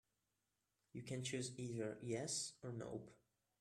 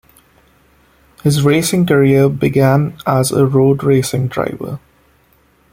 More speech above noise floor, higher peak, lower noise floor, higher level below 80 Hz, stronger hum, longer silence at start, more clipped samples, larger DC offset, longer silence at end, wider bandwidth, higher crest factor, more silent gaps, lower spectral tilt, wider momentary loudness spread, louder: about the same, 42 dB vs 41 dB; second, -32 dBFS vs 0 dBFS; first, -89 dBFS vs -53 dBFS; second, -80 dBFS vs -48 dBFS; neither; second, 0.95 s vs 1.25 s; neither; neither; second, 0.45 s vs 0.95 s; second, 14 kHz vs 16.5 kHz; about the same, 18 dB vs 14 dB; neither; second, -4 dB/octave vs -6 dB/octave; first, 12 LU vs 9 LU; second, -47 LUFS vs -13 LUFS